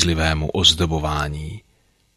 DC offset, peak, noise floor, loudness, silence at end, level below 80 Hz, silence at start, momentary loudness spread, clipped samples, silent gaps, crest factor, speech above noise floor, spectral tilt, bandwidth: under 0.1%; -2 dBFS; -61 dBFS; -18 LUFS; 0.6 s; -32 dBFS; 0 s; 18 LU; under 0.1%; none; 20 dB; 41 dB; -3.5 dB/octave; 15 kHz